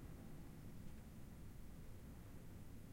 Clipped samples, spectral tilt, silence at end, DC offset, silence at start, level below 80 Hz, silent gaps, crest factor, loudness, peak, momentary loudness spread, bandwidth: under 0.1%; -6.5 dB/octave; 0 s; under 0.1%; 0 s; -60 dBFS; none; 14 dB; -59 LUFS; -40 dBFS; 1 LU; 16.5 kHz